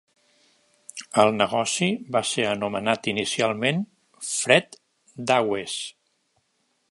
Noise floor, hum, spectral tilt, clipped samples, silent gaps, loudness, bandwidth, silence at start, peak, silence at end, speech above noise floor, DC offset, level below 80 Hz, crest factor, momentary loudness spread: -71 dBFS; none; -3.5 dB/octave; under 0.1%; none; -23 LUFS; 11.5 kHz; 0.95 s; -2 dBFS; 1 s; 48 dB; under 0.1%; -66 dBFS; 24 dB; 16 LU